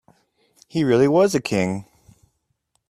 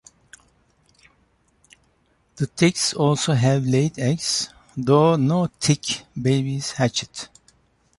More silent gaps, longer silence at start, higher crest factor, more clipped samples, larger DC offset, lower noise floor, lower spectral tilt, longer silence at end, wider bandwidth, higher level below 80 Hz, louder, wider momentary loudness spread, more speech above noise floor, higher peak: neither; second, 0.75 s vs 2.35 s; about the same, 18 dB vs 18 dB; neither; neither; first, -71 dBFS vs -64 dBFS; about the same, -6 dB/octave vs -5 dB/octave; first, 1.05 s vs 0.75 s; first, 14.5 kHz vs 11.5 kHz; about the same, -58 dBFS vs -56 dBFS; about the same, -19 LUFS vs -21 LUFS; about the same, 12 LU vs 11 LU; first, 53 dB vs 43 dB; about the same, -6 dBFS vs -4 dBFS